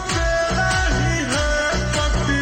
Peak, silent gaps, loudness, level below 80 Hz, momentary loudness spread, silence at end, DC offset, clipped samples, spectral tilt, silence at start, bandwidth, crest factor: -8 dBFS; none; -20 LUFS; -26 dBFS; 2 LU; 0 s; under 0.1%; under 0.1%; -4 dB/octave; 0 s; 15.5 kHz; 10 dB